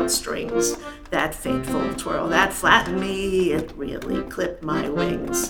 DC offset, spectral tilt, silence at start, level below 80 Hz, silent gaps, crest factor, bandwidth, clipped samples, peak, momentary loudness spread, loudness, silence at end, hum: under 0.1%; -3.5 dB/octave; 0 s; -42 dBFS; none; 22 dB; over 20 kHz; under 0.1%; 0 dBFS; 10 LU; -23 LUFS; 0 s; none